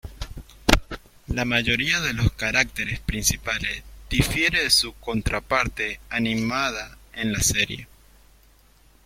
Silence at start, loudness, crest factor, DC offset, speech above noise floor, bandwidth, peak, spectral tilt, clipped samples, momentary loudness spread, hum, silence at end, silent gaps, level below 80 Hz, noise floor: 0.05 s; -23 LUFS; 26 dB; under 0.1%; 31 dB; 16.5 kHz; 0 dBFS; -3 dB/octave; under 0.1%; 14 LU; none; 1.2 s; none; -36 dBFS; -55 dBFS